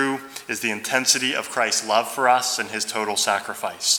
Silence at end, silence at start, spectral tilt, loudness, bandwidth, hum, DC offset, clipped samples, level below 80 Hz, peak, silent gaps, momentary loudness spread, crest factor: 0 s; 0 s; -0.5 dB/octave; -21 LUFS; over 20 kHz; none; under 0.1%; under 0.1%; -72 dBFS; -2 dBFS; none; 7 LU; 22 dB